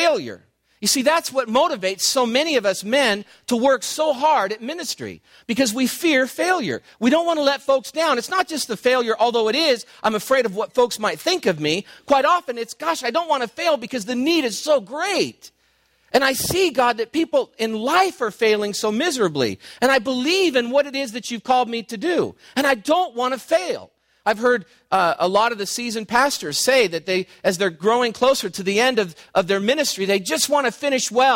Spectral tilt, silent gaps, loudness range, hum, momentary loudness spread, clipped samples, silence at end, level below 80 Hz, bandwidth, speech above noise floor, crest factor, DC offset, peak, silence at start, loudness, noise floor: -3 dB/octave; none; 2 LU; none; 7 LU; under 0.1%; 0 s; -60 dBFS; 16.5 kHz; 42 dB; 16 dB; under 0.1%; -4 dBFS; 0 s; -20 LUFS; -62 dBFS